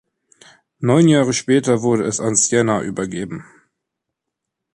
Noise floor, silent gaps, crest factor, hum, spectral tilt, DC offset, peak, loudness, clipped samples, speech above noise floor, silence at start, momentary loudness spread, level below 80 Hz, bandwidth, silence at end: -81 dBFS; none; 16 dB; none; -5 dB/octave; under 0.1%; -2 dBFS; -17 LUFS; under 0.1%; 64 dB; 0.8 s; 13 LU; -56 dBFS; 11.5 kHz; 1.35 s